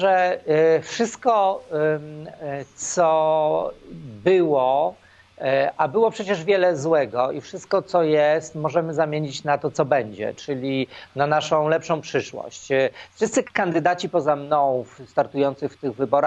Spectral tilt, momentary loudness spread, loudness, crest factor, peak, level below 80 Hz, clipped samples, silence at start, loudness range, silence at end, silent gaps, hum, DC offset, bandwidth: -5 dB/octave; 10 LU; -22 LUFS; 18 dB; -4 dBFS; -64 dBFS; under 0.1%; 0 s; 2 LU; 0 s; none; none; under 0.1%; 9 kHz